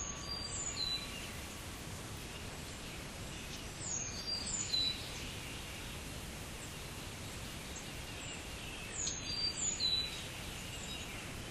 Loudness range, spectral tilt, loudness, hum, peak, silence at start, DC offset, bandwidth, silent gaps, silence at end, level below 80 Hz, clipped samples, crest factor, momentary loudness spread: 7 LU; -2 dB/octave; -40 LUFS; none; -24 dBFS; 0 s; under 0.1%; 15.5 kHz; none; 0 s; -54 dBFS; under 0.1%; 18 dB; 12 LU